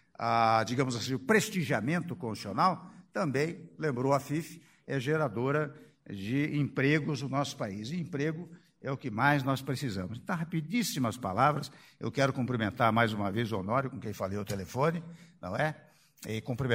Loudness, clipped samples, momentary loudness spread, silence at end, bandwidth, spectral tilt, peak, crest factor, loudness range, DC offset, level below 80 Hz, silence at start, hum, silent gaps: -31 LUFS; under 0.1%; 12 LU; 0 s; 16 kHz; -5.5 dB/octave; -10 dBFS; 22 dB; 3 LU; under 0.1%; -66 dBFS; 0.2 s; none; none